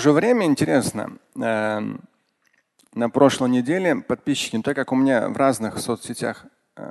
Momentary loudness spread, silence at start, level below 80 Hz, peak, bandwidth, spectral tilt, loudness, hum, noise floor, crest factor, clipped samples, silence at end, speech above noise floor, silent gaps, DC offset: 14 LU; 0 s; -60 dBFS; -2 dBFS; 12.5 kHz; -5 dB/octave; -21 LUFS; none; -66 dBFS; 20 dB; under 0.1%; 0 s; 45 dB; none; under 0.1%